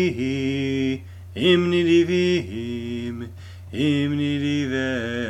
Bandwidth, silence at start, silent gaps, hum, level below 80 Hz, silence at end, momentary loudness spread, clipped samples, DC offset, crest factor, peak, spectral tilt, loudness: 11 kHz; 0 s; none; none; -52 dBFS; 0 s; 14 LU; under 0.1%; under 0.1%; 16 dB; -6 dBFS; -6.5 dB/octave; -22 LUFS